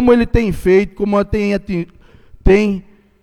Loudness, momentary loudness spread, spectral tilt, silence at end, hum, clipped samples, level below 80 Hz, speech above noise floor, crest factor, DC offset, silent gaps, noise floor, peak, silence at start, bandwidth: -15 LUFS; 10 LU; -7.5 dB/octave; 0.4 s; none; under 0.1%; -26 dBFS; 28 dB; 14 dB; under 0.1%; none; -41 dBFS; 0 dBFS; 0 s; 13.5 kHz